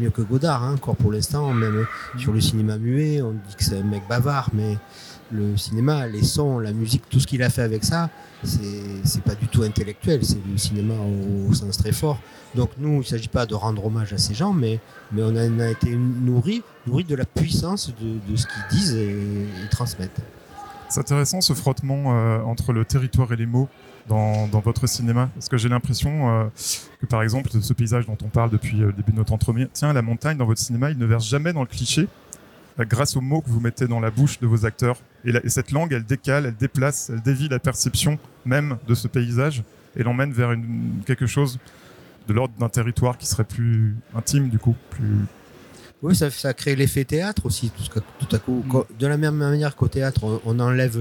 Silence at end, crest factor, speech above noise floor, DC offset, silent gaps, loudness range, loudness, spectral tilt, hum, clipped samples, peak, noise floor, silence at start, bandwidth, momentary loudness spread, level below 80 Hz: 0 s; 16 dB; 24 dB; under 0.1%; none; 2 LU; -22 LUFS; -5.5 dB/octave; none; under 0.1%; -6 dBFS; -46 dBFS; 0 s; 18 kHz; 6 LU; -44 dBFS